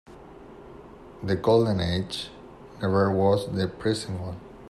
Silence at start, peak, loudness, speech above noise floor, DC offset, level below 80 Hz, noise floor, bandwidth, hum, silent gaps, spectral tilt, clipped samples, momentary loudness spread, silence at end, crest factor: 0.1 s; -8 dBFS; -25 LUFS; 21 dB; under 0.1%; -54 dBFS; -46 dBFS; 13 kHz; none; none; -6.5 dB/octave; under 0.1%; 24 LU; 0 s; 18 dB